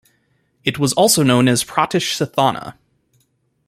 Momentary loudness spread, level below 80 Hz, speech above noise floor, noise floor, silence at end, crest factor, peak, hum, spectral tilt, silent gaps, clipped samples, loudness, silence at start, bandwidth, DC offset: 11 LU; -56 dBFS; 48 dB; -64 dBFS; 0.95 s; 18 dB; -2 dBFS; none; -4 dB/octave; none; under 0.1%; -16 LUFS; 0.65 s; 14.5 kHz; under 0.1%